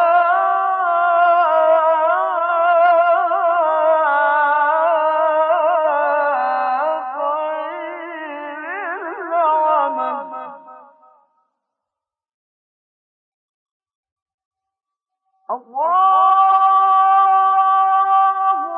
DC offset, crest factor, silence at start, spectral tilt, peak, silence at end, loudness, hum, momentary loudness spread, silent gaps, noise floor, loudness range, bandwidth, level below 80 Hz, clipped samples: under 0.1%; 12 dB; 0 s; -6 dB/octave; -4 dBFS; 0 s; -16 LUFS; none; 14 LU; 12.34-13.80 s, 13.95-14.03 s, 14.12-14.16 s, 14.22-14.26 s, 14.34-14.38 s, 14.45-14.51 s; -86 dBFS; 8 LU; 4.4 kHz; under -90 dBFS; under 0.1%